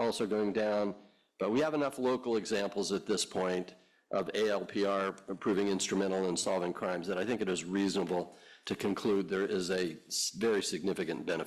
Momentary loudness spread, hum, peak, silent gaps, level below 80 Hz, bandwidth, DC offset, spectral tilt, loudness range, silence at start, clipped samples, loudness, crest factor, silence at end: 6 LU; none; -20 dBFS; none; -70 dBFS; 14.5 kHz; under 0.1%; -4 dB/octave; 1 LU; 0 s; under 0.1%; -33 LUFS; 14 dB; 0 s